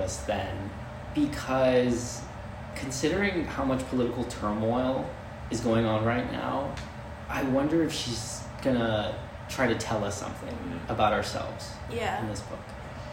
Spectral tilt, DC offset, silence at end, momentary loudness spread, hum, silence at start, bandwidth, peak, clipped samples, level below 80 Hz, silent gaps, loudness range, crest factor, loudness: -5 dB/octave; under 0.1%; 0 s; 13 LU; none; 0 s; 16 kHz; -10 dBFS; under 0.1%; -46 dBFS; none; 2 LU; 18 dB; -29 LUFS